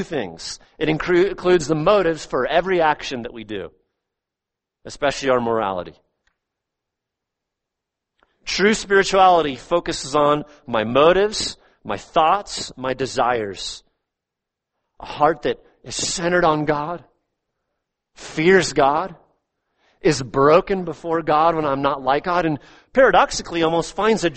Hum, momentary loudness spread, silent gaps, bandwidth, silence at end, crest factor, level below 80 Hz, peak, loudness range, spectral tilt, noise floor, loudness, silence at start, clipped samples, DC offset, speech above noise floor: none; 15 LU; none; 8.8 kHz; 0 s; 20 dB; -46 dBFS; -2 dBFS; 8 LU; -4.5 dB/octave; -85 dBFS; -19 LUFS; 0 s; under 0.1%; under 0.1%; 66 dB